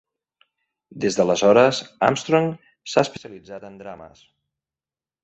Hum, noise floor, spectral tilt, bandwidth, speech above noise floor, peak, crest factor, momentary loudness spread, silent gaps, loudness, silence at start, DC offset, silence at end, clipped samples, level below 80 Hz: none; under -90 dBFS; -4.5 dB/octave; 8.2 kHz; over 69 dB; 0 dBFS; 22 dB; 23 LU; none; -20 LUFS; 0.95 s; under 0.1%; 1.15 s; under 0.1%; -62 dBFS